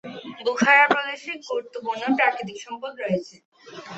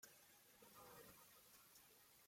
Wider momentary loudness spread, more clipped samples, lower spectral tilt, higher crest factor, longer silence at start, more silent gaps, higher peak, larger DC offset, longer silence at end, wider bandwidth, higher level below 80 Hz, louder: first, 18 LU vs 5 LU; neither; first, -4 dB/octave vs -2 dB/octave; about the same, 22 dB vs 20 dB; about the same, 0.05 s vs 0 s; first, 3.45-3.52 s vs none; first, -2 dBFS vs -48 dBFS; neither; about the same, 0 s vs 0 s; second, 8.2 kHz vs 16.5 kHz; first, -70 dBFS vs -90 dBFS; first, -22 LUFS vs -65 LUFS